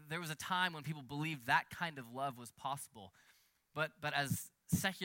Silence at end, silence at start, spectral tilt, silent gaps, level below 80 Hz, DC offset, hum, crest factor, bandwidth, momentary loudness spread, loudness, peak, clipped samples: 0 s; 0 s; -4 dB/octave; none; -74 dBFS; under 0.1%; none; 22 dB; 17 kHz; 11 LU; -40 LUFS; -18 dBFS; under 0.1%